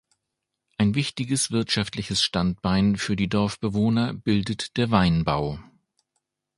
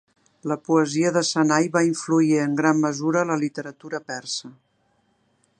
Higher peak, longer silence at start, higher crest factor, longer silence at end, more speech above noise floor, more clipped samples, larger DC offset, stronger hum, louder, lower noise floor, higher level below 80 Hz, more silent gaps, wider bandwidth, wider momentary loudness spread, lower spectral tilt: about the same, -4 dBFS vs -4 dBFS; first, 0.8 s vs 0.45 s; about the same, 22 dB vs 18 dB; second, 0.95 s vs 1.1 s; first, 59 dB vs 45 dB; neither; neither; neither; about the same, -24 LUFS vs -22 LUFS; first, -82 dBFS vs -66 dBFS; first, -46 dBFS vs -74 dBFS; neither; first, 11.5 kHz vs 9.6 kHz; second, 5 LU vs 12 LU; about the same, -5 dB/octave vs -5 dB/octave